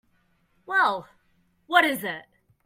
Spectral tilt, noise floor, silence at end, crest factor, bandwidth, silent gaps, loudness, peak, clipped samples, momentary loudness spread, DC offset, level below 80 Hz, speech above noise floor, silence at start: -3 dB/octave; -67 dBFS; 0.45 s; 22 dB; 16 kHz; none; -24 LUFS; -4 dBFS; under 0.1%; 14 LU; under 0.1%; -72 dBFS; 43 dB; 0.7 s